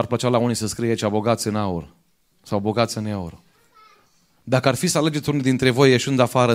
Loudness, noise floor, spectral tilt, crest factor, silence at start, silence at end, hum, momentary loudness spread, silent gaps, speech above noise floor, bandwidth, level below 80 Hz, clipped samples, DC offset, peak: -21 LUFS; -60 dBFS; -5 dB/octave; 20 dB; 0 s; 0 s; none; 11 LU; none; 40 dB; 16 kHz; -54 dBFS; under 0.1%; under 0.1%; 0 dBFS